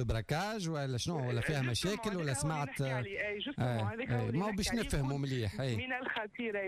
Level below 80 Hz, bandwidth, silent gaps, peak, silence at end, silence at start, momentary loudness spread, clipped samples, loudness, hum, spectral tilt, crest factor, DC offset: -50 dBFS; 15.5 kHz; none; -24 dBFS; 0 s; 0 s; 3 LU; under 0.1%; -36 LUFS; none; -5 dB/octave; 12 dB; under 0.1%